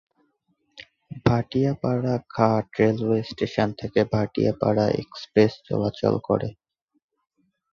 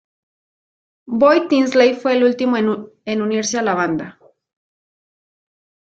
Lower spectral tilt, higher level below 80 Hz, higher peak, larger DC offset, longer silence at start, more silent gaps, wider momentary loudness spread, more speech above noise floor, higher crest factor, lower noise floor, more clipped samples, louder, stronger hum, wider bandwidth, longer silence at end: first, -8 dB/octave vs -4.5 dB/octave; first, -52 dBFS vs -64 dBFS; about the same, -4 dBFS vs -2 dBFS; neither; second, 0.75 s vs 1.1 s; neither; second, 6 LU vs 12 LU; second, 48 dB vs over 74 dB; about the same, 20 dB vs 18 dB; second, -71 dBFS vs under -90 dBFS; neither; second, -24 LUFS vs -17 LUFS; neither; second, 7.2 kHz vs 8.8 kHz; second, 1.2 s vs 1.75 s